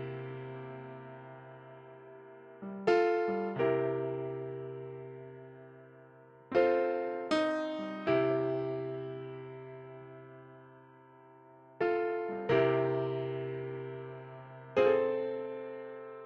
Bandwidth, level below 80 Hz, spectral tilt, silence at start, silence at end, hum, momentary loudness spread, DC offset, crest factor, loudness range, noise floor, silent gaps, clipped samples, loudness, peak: 8.8 kHz; -74 dBFS; -7.5 dB/octave; 0 s; 0 s; none; 23 LU; under 0.1%; 20 dB; 6 LU; -57 dBFS; none; under 0.1%; -33 LUFS; -14 dBFS